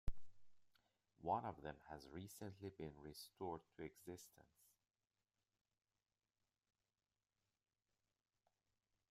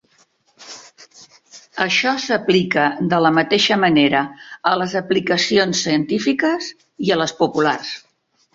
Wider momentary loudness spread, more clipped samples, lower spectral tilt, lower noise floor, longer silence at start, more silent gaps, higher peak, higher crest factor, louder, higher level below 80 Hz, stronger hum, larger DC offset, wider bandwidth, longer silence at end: about the same, 13 LU vs 15 LU; neither; first, -5.5 dB/octave vs -4 dB/octave; first, under -90 dBFS vs -62 dBFS; second, 0.05 s vs 0.6 s; neither; second, -30 dBFS vs -2 dBFS; first, 24 dB vs 18 dB; second, -52 LUFS vs -17 LUFS; about the same, -62 dBFS vs -60 dBFS; neither; neither; first, 15.5 kHz vs 7.8 kHz; first, 4.7 s vs 0.55 s